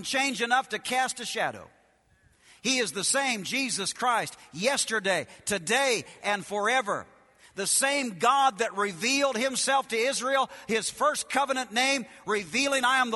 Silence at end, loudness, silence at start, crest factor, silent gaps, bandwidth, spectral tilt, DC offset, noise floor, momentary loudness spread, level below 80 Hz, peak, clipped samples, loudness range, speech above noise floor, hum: 0 s; -26 LUFS; 0 s; 18 dB; none; 12 kHz; -1.5 dB/octave; under 0.1%; -64 dBFS; 7 LU; -70 dBFS; -10 dBFS; under 0.1%; 3 LU; 36 dB; none